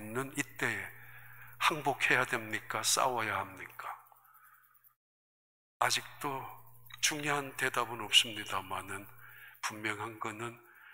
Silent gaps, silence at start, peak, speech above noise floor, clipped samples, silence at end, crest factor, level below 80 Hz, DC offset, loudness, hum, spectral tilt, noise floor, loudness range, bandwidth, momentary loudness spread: 4.96-5.80 s; 0 s; -10 dBFS; 29 dB; under 0.1%; 0 s; 26 dB; -72 dBFS; under 0.1%; -33 LUFS; 60 Hz at -65 dBFS; -1.5 dB/octave; -64 dBFS; 6 LU; 16 kHz; 21 LU